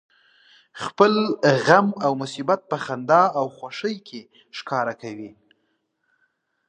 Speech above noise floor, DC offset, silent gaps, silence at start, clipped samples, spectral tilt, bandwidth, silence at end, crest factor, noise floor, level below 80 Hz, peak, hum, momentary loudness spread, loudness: 50 dB; under 0.1%; none; 0.75 s; under 0.1%; -5.5 dB/octave; 9.8 kHz; 1.4 s; 22 dB; -72 dBFS; -72 dBFS; 0 dBFS; none; 20 LU; -21 LUFS